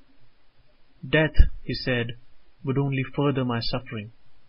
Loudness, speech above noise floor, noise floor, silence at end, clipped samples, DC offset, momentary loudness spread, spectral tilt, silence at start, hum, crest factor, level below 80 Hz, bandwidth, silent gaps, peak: -26 LUFS; 30 dB; -52 dBFS; 0.05 s; under 0.1%; under 0.1%; 14 LU; -11 dB/octave; 0.15 s; none; 24 dB; -28 dBFS; 5.6 kHz; none; 0 dBFS